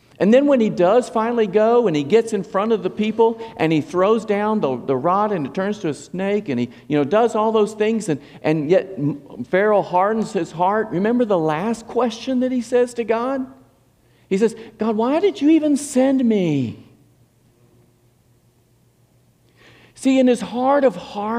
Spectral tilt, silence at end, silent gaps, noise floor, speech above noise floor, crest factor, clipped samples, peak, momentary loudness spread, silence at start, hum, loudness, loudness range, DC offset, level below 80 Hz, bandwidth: -6.5 dB/octave; 0 s; none; -58 dBFS; 39 dB; 16 dB; under 0.1%; -4 dBFS; 8 LU; 0.2 s; none; -19 LUFS; 4 LU; under 0.1%; -62 dBFS; 12.5 kHz